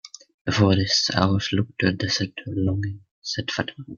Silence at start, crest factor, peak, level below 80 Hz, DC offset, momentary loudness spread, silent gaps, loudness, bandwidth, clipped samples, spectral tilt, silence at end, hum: 0.05 s; 22 dB; -2 dBFS; -54 dBFS; under 0.1%; 12 LU; 0.34-0.45 s, 3.11-3.22 s; -23 LUFS; 7.2 kHz; under 0.1%; -4.5 dB/octave; 0 s; none